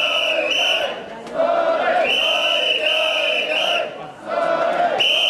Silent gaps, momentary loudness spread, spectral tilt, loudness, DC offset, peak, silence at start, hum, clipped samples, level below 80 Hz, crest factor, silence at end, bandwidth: none; 10 LU; -1 dB/octave; -18 LUFS; under 0.1%; -6 dBFS; 0 s; none; under 0.1%; -62 dBFS; 12 dB; 0 s; 13.5 kHz